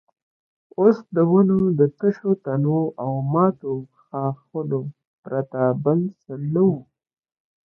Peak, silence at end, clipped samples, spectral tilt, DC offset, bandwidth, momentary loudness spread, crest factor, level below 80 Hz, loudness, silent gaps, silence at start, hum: -2 dBFS; 0.85 s; under 0.1%; -12 dB/octave; under 0.1%; 5.6 kHz; 12 LU; 20 dB; -62 dBFS; -21 LUFS; 5.07-5.23 s; 0.8 s; none